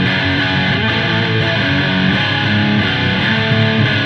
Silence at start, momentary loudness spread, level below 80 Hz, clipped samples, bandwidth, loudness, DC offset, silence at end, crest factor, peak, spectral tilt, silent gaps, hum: 0 s; 1 LU; -40 dBFS; under 0.1%; 8 kHz; -14 LUFS; under 0.1%; 0 s; 14 dB; 0 dBFS; -6.5 dB/octave; none; none